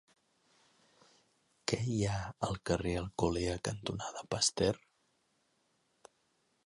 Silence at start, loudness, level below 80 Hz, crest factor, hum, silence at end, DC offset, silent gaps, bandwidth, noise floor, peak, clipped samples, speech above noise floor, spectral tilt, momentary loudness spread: 1.65 s; -35 LUFS; -54 dBFS; 24 dB; none; 1.9 s; under 0.1%; none; 11.5 kHz; -76 dBFS; -14 dBFS; under 0.1%; 42 dB; -4.5 dB/octave; 8 LU